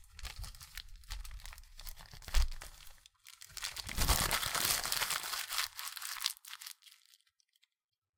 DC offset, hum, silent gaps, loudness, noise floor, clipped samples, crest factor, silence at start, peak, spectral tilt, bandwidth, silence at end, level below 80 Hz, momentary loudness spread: under 0.1%; none; none; -36 LUFS; -76 dBFS; under 0.1%; 30 dB; 0 s; -10 dBFS; -1 dB/octave; 19 kHz; 1.3 s; -44 dBFS; 21 LU